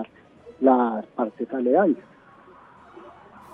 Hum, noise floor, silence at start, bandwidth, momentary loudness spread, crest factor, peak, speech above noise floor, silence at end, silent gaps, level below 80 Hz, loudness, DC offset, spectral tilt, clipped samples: none; -50 dBFS; 0 s; 3.8 kHz; 11 LU; 20 dB; -6 dBFS; 28 dB; 0.45 s; none; -70 dBFS; -23 LUFS; under 0.1%; -9 dB/octave; under 0.1%